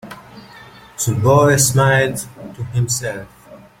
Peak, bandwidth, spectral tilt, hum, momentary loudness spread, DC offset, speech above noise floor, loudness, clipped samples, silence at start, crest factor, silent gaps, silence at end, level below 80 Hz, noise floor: -2 dBFS; 16.5 kHz; -4.5 dB/octave; none; 21 LU; under 0.1%; 25 dB; -16 LUFS; under 0.1%; 0.05 s; 16 dB; none; 0.25 s; -46 dBFS; -41 dBFS